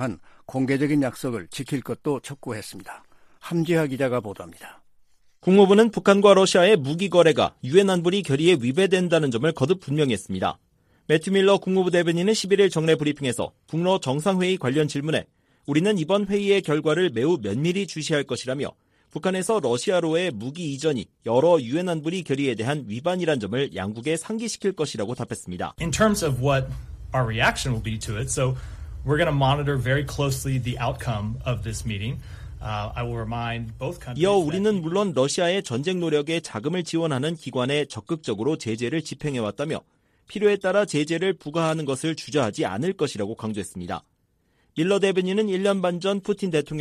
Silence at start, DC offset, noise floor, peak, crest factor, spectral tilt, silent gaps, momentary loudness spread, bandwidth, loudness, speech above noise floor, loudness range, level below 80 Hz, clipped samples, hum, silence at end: 0 s; under 0.1%; -67 dBFS; -2 dBFS; 20 dB; -5.5 dB/octave; none; 12 LU; 15 kHz; -23 LUFS; 44 dB; 8 LU; -46 dBFS; under 0.1%; none; 0 s